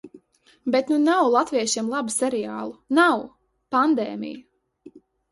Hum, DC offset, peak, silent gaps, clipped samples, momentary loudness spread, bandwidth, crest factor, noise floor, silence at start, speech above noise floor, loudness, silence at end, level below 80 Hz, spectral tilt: none; under 0.1%; -4 dBFS; none; under 0.1%; 15 LU; 11.5 kHz; 20 dB; -57 dBFS; 0.05 s; 36 dB; -22 LUFS; 0.35 s; -68 dBFS; -3 dB/octave